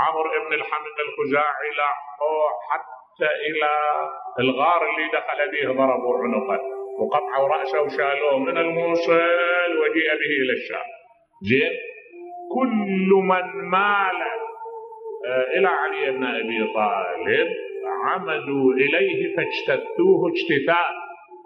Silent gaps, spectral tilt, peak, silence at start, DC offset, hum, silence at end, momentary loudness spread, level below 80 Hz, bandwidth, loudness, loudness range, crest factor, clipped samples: none; -7 dB/octave; -4 dBFS; 0 s; under 0.1%; none; 0 s; 11 LU; -74 dBFS; 6.2 kHz; -22 LUFS; 3 LU; 18 dB; under 0.1%